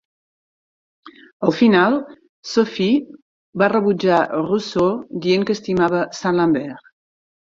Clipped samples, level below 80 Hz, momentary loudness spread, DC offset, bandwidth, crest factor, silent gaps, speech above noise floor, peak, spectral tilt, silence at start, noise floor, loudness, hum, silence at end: under 0.1%; -58 dBFS; 8 LU; under 0.1%; 7.6 kHz; 18 dB; 1.33-1.40 s, 2.29-2.43 s, 3.22-3.53 s; over 72 dB; -2 dBFS; -6 dB/octave; 1.05 s; under -90 dBFS; -18 LUFS; none; 0.75 s